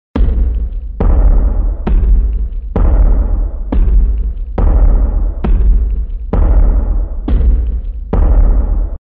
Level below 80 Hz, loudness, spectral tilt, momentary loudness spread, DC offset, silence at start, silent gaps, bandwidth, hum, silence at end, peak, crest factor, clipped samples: -10 dBFS; -15 LUFS; -12 dB/octave; 7 LU; under 0.1%; 0.15 s; none; 2.6 kHz; none; 0.2 s; -2 dBFS; 10 dB; under 0.1%